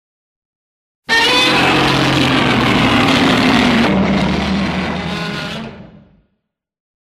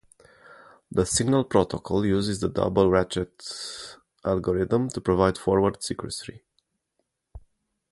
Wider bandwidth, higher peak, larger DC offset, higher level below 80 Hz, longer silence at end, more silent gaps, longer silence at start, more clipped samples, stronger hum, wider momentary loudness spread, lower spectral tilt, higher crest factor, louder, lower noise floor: first, 15.5 kHz vs 11.5 kHz; first, 0 dBFS vs -4 dBFS; neither; first, -36 dBFS vs -46 dBFS; first, 1.3 s vs 0.55 s; neither; first, 1.1 s vs 0.5 s; neither; neither; about the same, 11 LU vs 13 LU; about the same, -4.5 dB/octave vs -5.5 dB/octave; second, 16 dB vs 22 dB; first, -13 LUFS vs -25 LUFS; second, -71 dBFS vs -77 dBFS